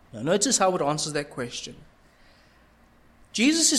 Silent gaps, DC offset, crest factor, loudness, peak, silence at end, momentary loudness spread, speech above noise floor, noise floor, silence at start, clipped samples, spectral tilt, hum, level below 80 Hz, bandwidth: none; under 0.1%; 20 dB; -24 LUFS; -6 dBFS; 0 s; 13 LU; 33 dB; -57 dBFS; 0.15 s; under 0.1%; -2.5 dB/octave; none; -60 dBFS; 15 kHz